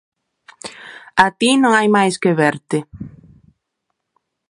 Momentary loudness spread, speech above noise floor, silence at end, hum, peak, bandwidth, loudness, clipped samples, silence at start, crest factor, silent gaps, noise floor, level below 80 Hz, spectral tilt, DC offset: 22 LU; 60 dB; 1.4 s; none; 0 dBFS; 11.5 kHz; -15 LUFS; under 0.1%; 0.65 s; 18 dB; none; -75 dBFS; -54 dBFS; -4.5 dB/octave; under 0.1%